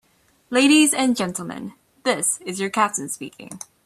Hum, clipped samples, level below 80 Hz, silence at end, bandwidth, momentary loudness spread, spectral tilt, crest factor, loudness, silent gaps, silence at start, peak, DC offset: none; under 0.1%; -66 dBFS; 0.25 s; 14 kHz; 21 LU; -2.5 dB/octave; 18 dB; -20 LUFS; none; 0.5 s; -4 dBFS; under 0.1%